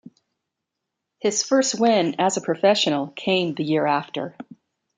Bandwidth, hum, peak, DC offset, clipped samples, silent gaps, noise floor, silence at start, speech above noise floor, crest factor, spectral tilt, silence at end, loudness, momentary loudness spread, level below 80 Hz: 9.6 kHz; none; -6 dBFS; under 0.1%; under 0.1%; none; -82 dBFS; 1.25 s; 61 dB; 18 dB; -3.5 dB/octave; 0.55 s; -21 LUFS; 8 LU; -72 dBFS